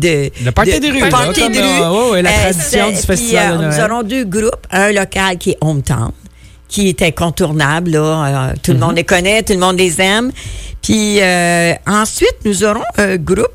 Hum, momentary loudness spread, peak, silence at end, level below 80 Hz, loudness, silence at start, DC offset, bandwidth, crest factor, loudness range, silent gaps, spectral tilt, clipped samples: none; 5 LU; -2 dBFS; 0.05 s; -30 dBFS; -12 LUFS; 0 s; under 0.1%; 16.5 kHz; 12 dB; 3 LU; none; -4 dB/octave; under 0.1%